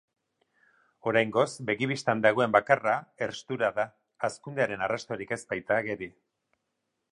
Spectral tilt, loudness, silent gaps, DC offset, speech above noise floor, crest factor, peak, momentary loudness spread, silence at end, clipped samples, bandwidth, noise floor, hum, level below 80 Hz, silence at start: -5 dB/octave; -28 LUFS; none; under 0.1%; 53 dB; 24 dB; -6 dBFS; 11 LU; 1 s; under 0.1%; 11.5 kHz; -81 dBFS; none; -70 dBFS; 1.05 s